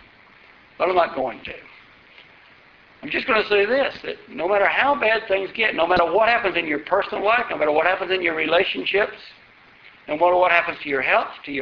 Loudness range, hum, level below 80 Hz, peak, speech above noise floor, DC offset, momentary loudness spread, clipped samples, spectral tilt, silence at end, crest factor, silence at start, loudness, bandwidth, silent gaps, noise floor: 5 LU; none; -56 dBFS; 0 dBFS; 30 dB; under 0.1%; 11 LU; under 0.1%; -0.5 dB/octave; 0 s; 20 dB; 0.8 s; -20 LUFS; 6.4 kHz; none; -51 dBFS